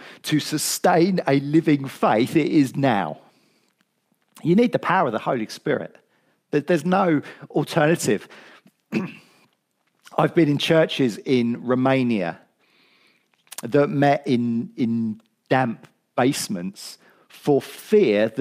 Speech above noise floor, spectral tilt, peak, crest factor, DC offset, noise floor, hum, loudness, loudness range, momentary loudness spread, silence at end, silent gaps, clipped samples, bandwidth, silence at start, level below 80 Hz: 49 dB; -5.5 dB/octave; -4 dBFS; 18 dB; under 0.1%; -70 dBFS; none; -21 LUFS; 4 LU; 11 LU; 0 s; none; under 0.1%; 15.5 kHz; 0 s; -72 dBFS